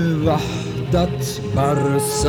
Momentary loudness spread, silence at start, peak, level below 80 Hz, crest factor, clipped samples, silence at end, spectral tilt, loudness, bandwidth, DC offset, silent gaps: 6 LU; 0 s; -6 dBFS; -34 dBFS; 14 dB; under 0.1%; 0 s; -5.5 dB/octave; -20 LUFS; 19 kHz; under 0.1%; none